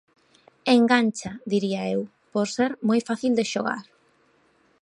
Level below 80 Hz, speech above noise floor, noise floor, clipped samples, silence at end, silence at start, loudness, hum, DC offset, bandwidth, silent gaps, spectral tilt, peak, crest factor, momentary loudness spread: -66 dBFS; 40 dB; -63 dBFS; under 0.1%; 1 s; 0.65 s; -24 LUFS; none; under 0.1%; 11 kHz; none; -5 dB/octave; -6 dBFS; 20 dB; 11 LU